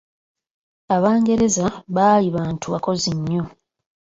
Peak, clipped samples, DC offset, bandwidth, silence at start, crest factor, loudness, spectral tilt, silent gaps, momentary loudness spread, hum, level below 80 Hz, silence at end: -4 dBFS; under 0.1%; under 0.1%; 8 kHz; 0.9 s; 16 dB; -19 LUFS; -5.5 dB/octave; none; 9 LU; none; -52 dBFS; 0.65 s